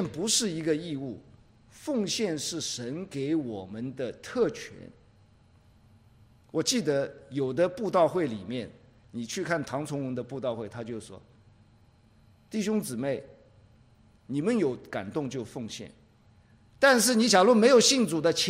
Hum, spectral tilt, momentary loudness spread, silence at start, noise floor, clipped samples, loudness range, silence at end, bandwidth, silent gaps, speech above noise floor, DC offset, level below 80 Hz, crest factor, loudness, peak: none; -3.5 dB/octave; 18 LU; 0 s; -60 dBFS; under 0.1%; 10 LU; 0 s; 16 kHz; none; 32 dB; under 0.1%; -66 dBFS; 20 dB; -27 LUFS; -8 dBFS